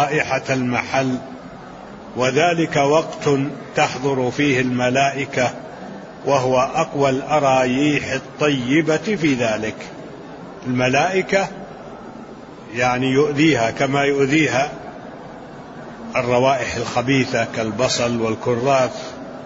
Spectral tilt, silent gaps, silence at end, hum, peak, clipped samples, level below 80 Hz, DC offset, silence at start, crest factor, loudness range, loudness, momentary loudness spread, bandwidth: -5 dB/octave; none; 0 s; none; -4 dBFS; under 0.1%; -52 dBFS; under 0.1%; 0 s; 16 dB; 3 LU; -19 LUFS; 19 LU; 8 kHz